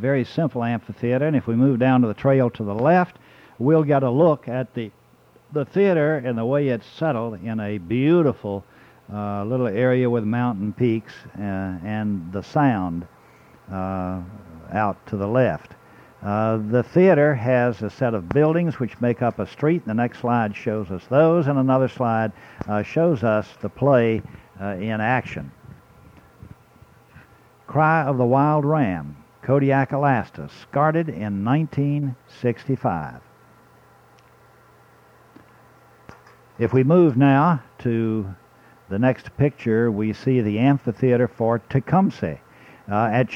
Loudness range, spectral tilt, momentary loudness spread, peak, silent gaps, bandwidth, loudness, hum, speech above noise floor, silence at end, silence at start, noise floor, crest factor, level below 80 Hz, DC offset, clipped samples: 6 LU; -9.5 dB/octave; 12 LU; -4 dBFS; none; 7 kHz; -21 LUFS; none; 34 dB; 0 s; 0 s; -54 dBFS; 16 dB; -56 dBFS; under 0.1%; under 0.1%